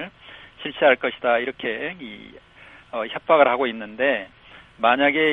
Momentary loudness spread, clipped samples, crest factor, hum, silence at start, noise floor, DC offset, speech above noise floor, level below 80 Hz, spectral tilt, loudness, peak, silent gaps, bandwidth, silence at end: 19 LU; under 0.1%; 20 dB; none; 0 s; -45 dBFS; under 0.1%; 24 dB; -60 dBFS; -6.5 dB/octave; -21 LUFS; -2 dBFS; none; 4.1 kHz; 0 s